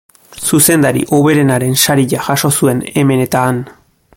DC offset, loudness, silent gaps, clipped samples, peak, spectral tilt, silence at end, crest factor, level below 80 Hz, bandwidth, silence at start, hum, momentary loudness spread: under 0.1%; -12 LUFS; none; under 0.1%; 0 dBFS; -4.5 dB/octave; 0.45 s; 12 dB; -48 dBFS; 17.5 kHz; 0.3 s; none; 7 LU